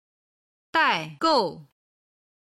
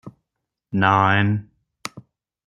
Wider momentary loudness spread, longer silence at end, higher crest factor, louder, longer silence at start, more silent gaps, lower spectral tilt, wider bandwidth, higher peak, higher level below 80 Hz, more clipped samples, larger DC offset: second, 6 LU vs 19 LU; first, 0.8 s vs 0.45 s; about the same, 18 dB vs 20 dB; second, -23 LUFS vs -19 LUFS; first, 0.75 s vs 0.05 s; neither; second, -4 dB/octave vs -6.5 dB/octave; about the same, 13 kHz vs 12 kHz; second, -8 dBFS vs -2 dBFS; second, -70 dBFS vs -60 dBFS; neither; neither